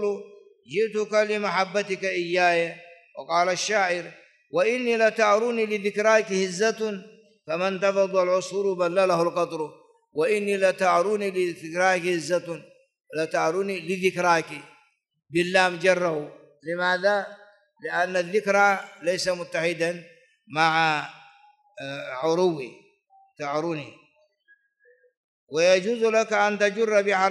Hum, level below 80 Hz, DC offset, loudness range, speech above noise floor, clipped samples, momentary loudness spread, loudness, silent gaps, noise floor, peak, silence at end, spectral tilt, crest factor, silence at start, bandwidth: none; -76 dBFS; under 0.1%; 4 LU; 39 dB; under 0.1%; 15 LU; -24 LUFS; 25.17-25.47 s; -63 dBFS; -6 dBFS; 0 s; -4 dB/octave; 20 dB; 0 s; 12 kHz